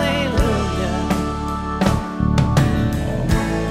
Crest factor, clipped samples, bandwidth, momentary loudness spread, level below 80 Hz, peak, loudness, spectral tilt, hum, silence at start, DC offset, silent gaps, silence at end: 16 dB; under 0.1%; 16 kHz; 5 LU; -26 dBFS; -2 dBFS; -20 LUFS; -6.5 dB/octave; none; 0 s; under 0.1%; none; 0 s